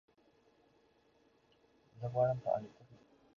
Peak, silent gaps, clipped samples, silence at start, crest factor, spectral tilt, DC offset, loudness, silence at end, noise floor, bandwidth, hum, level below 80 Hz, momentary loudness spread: -20 dBFS; none; under 0.1%; 1.95 s; 22 dB; -8 dB/octave; under 0.1%; -37 LUFS; 0.45 s; -71 dBFS; 6.8 kHz; none; -74 dBFS; 13 LU